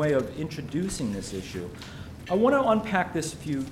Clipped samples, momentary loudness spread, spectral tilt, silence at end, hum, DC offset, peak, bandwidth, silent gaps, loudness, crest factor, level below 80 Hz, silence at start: under 0.1%; 16 LU; -5.5 dB/octave; 0 s; none; under 0.1%; -10 dBFS; 16 kHz; none; -27 LUFS; 18 dB; -50 dBFS; 0 s